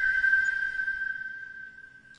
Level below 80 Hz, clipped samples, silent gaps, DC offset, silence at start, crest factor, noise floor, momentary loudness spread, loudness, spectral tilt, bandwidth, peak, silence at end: -60 dBFS; under 0.1%; none; under 0.1%; 0 s; 16 dB; -50 dBFS; 20 LU; -27 LUFS; -0.5 dB/octave; 9.8 kHz; -14 dBFS; 0.05 s